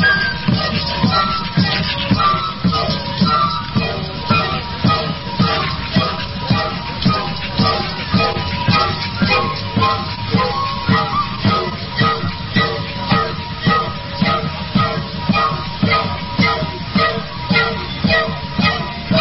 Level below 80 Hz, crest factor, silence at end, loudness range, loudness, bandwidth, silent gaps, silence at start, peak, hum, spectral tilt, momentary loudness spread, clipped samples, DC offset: -36 dBFS; 16 dB; 0 s; 2 LU; -17 LUFS; 5.8 kHz; none; 0 s; -2 dBFS; none; -9 dB/octave; 5 LU; under 0.1%; 0.9%